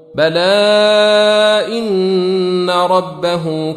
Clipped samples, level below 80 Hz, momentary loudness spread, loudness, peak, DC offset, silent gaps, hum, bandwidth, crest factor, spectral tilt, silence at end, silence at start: under 0.1%; -58 dBFS; 7 LU; -12 LUFS; -2 dBFS; under 0.1%; none; none; 11.5 kHz; 12 dB; -5 dB/octave; 0 s; 0.15 s